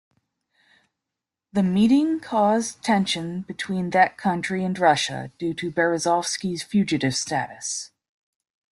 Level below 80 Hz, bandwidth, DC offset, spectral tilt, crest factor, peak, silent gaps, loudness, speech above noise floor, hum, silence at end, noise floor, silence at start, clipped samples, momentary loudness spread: -62 dBFS; 12.5 kHz; under 0.1%; -4.5 dB/octave; 20 dB; -4 dBFS; none; -23 LUFS; 64 dB; none; 0.85 s; -86 dBFS; 1.55 s; under 0.1%; 10 LU